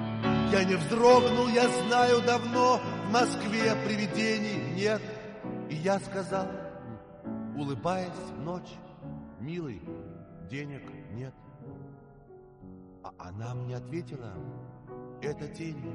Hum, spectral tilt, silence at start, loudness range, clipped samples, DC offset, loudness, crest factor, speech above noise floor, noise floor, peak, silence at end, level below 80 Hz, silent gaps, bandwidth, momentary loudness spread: none; -5.5 dB/octave; 0 s; 18 LU; under 0.1%; under 0.1%; -29 LUFS; 20 dB; 24 dB; -52 dBFS; -10 dBFS; 0 s; -58 dBFS; none; 11.5 kHz; 22 LU